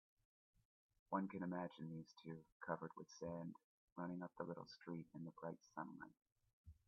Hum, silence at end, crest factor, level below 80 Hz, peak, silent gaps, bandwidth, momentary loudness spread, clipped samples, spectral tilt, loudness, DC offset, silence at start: none; 0.15 s; 24 dB; -82 dBFS; -28 dBFS; 2.52-2.60 s, 3.64-3.96 s, 6.53-6.64 s; 6.8 kHz; 10 LU; under 0.1%; -6.5 dB/octave; -52 LUFS; under 0.1%; 1.1 s